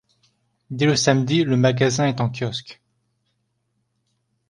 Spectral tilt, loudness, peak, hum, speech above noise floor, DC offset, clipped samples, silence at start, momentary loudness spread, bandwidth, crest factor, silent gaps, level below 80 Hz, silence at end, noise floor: -5 dB/octave; -20 LUFS; -2 dBFS; none; 53 dB; under 0.1%; under 0.1%; 0.7 s; 10 LU; 11 kHz; 20 dB; none; -58 dBFS; 1.75 s; -72 dBFS